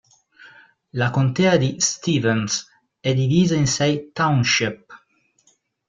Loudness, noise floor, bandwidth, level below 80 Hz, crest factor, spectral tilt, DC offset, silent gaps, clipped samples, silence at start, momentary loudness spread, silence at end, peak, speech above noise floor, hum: -20 LUFS; -62 dBFS; 9.4 kHz; -54 dBFS; 18 dB; -4.5 dB/octave; under 0.1%; none; under 0.1%; 0.95 s; 9 LU; 0.9 s; -2 dBFS; 43 dB; none